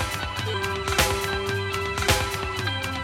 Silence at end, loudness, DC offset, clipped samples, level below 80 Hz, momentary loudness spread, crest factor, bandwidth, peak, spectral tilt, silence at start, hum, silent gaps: 0 s; -25 LUFS; under 0.1%; under 0.1%; -38 dBFS; 5 LU; 22 dB; 16.5 kHz; -4 dBFS; -3.5 dB/octave; 0 s; none; none